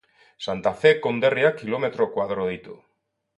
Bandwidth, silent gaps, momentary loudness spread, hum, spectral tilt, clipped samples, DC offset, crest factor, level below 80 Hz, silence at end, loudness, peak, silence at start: 8.6 kHz; none; 11 LU; none; -6 dB/octave; under 0.1%; under 0.1%; 20 dB; -60 dBFS; 0.65 s; -23 LUFS; -4 dBFS; 0.4 s